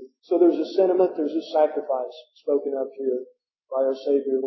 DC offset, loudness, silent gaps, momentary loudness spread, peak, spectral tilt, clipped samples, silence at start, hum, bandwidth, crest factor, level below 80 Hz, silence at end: under 0.1%; -24 LUFS; none; 10 LU; -6 dBFS; -7 dB/octave; under 0.1%; 0 s; none; 6 kHz; 16 dB; under -90 dBFS; 0 s